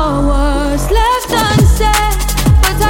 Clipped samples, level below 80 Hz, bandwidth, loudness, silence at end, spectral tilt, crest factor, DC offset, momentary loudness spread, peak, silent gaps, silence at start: under 0.1%; -14 dBFS; 17 kHz; -12 LUFS; 0 s; -5 dB/octave; 10 dB; under 0.1%; 4 LU; 0 dBFS; none; 0 s